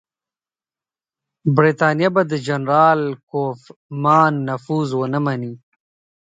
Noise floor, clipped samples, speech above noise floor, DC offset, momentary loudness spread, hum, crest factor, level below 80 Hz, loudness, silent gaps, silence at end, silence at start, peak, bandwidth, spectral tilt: under -90 dBFS; under 0.1%; over 72 dB; under 0.1%; 12 LU; none; 20 dB; -66 dBFS; -18 LUFS; 3.23-3.27 s, 3.76-3.89 s; 0.85 s; 1.45 s; 0 dBFS; 9 kHz; -7.5 dB/octave